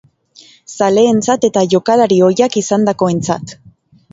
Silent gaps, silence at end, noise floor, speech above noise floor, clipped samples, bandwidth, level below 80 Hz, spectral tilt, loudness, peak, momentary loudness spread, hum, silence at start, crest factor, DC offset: none; 0.6 s; -45 dBFS; 33 dB; under 0.1%; 8 kHz; -54 dBFS; -5.5 dB/octave; -13 LUFS; 0 dBFS; 9 LU; none; 0.7 s; 14 dB; under 0.1%